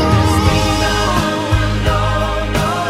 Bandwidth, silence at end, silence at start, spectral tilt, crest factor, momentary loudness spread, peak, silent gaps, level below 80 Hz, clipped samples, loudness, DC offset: 15.5 kHz; 0 s; 0 s; -5 dB/octave; 12 dB; 4 LU; -2 dBFS; none; -22 dBFS; under 0.1%; -15 LUFS; under 0.1%